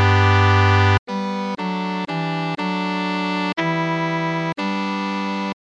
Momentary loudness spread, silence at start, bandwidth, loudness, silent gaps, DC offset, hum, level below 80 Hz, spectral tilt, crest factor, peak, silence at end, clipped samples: 10 LU; 0 s; 7.8 kHz; -20 LUFS; 0.99-1.06 s; under 0.1%; none; -50 dBFS; -6.5 dB/octave; 18 dB; -2 dBFS; 0.1 s; under 0.1%